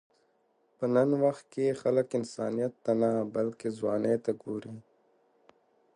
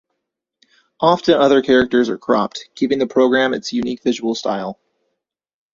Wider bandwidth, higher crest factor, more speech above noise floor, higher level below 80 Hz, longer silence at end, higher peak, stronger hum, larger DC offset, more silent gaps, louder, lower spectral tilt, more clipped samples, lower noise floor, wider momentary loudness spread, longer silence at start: first, 11 kHz vs 7.4 kHz; about the same, 18 dB vs 18 dB; second, 42 dB vs 62 dB; second, -76 dBFS vs -54 dBFS; first, 1.15 s vs 1 s; second, -14 dBFS vs 0 dBFS; neither; neither; neither; second, -30 LUFS vs -17 LUFS; first, -7.5 dB/octave vs -5 dB/octave; neither; second, -71 dBFS vs -78 dBFS; about the same, 10 LU vs 10 LU; second, 0.8 s vs 1 s